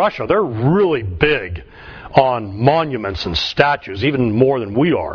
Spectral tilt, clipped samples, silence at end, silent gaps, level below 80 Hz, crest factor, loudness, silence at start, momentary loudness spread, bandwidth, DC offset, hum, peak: -7 dB/octave; under 0.1%; 0 s; none; -38 dBFS; 16 dB; -16 LUFS; 0 s; 7 LU; 5.4 kHz; under 0.1%; none; 0 dBFS